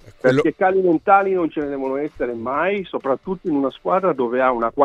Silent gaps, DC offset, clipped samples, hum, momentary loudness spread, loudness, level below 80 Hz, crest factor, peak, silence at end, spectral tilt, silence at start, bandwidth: none; under 0.1%; under 0.1%; none; 9 LU; -20 LUFS; -52 dBFS; 18 dB; 0 dBFS; 0 s; -7.5 dB/octave; 0.05 s; 8.4 kHz